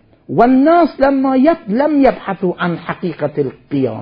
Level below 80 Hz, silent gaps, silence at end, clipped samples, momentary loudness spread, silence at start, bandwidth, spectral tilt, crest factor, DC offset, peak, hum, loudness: -46 dBFS; none; 0 s; under 0.1%; 10 LU; 0.3 s; 5.4 kHz; -10 dB/octave; 14 dB; under 0.1%; 0 dBFS; none; -14 LUFS